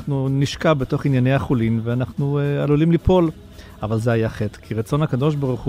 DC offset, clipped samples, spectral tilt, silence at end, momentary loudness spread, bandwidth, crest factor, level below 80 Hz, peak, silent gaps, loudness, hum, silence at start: under 0.1%; under 0.1%; -8 dB/octave; 0 s; 8 LU; 14 kHz; 14 dB; -38 dBFS; -4 dBFS; none; -20 LUFS; none; 0 s